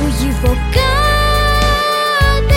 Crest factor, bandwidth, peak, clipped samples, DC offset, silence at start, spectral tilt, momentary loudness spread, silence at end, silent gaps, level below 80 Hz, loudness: 12 dB; 17 kHz; -2 dBFS; under 0.1%; under 0.1%; 0 s; -4.5 dB/octave; 3 LU; 0 s; none; -16 dBFS; -13 LUFS